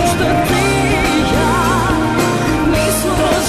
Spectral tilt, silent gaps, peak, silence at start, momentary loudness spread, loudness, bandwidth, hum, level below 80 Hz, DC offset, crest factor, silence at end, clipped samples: -4.5 dB/octave; none; -4 dBFS; 0 s; 1 LU; -14 LUFS; 14 kHz; none; -26 dBFS; under 0.1%; 10 dB; 0 s; under 0.1%